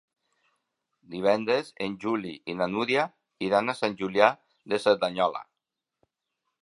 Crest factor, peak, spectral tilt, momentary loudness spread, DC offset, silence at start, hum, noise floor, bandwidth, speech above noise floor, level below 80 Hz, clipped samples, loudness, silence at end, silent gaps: 26 dB; -2 dBFS; -5 dB/octave; 11 LU; under 0.1%; 1.1 s; none; -86 dBFS; 11.5 kHz; 60 dB; -70 dBFS; under 0.1%; -27 LUFS; 1.2 s; none